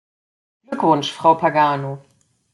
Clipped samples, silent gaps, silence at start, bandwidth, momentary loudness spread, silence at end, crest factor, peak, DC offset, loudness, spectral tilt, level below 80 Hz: under 0.1%; none; 0.7 s; 11.5 kHz; 15 LU; 0.55 s; 18 dB; -2 dBFS; under 0.1%; -17 LUFS; -5.5 dB/octave; -68 dBFS